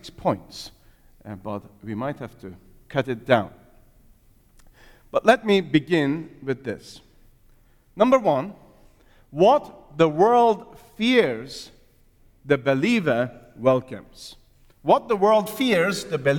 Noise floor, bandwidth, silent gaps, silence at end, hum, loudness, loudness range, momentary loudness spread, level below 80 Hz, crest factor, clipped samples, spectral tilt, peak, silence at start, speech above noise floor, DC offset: -56 dBFS; 19 kHz; none; 0 s; none; -22 LUFS; 8 LU; 20 LU; -56 dBFS; 20 dB; under 0.1%; -6 dB/octave; -2 dBFS; 0.05 s; 34 dB; under 0.1%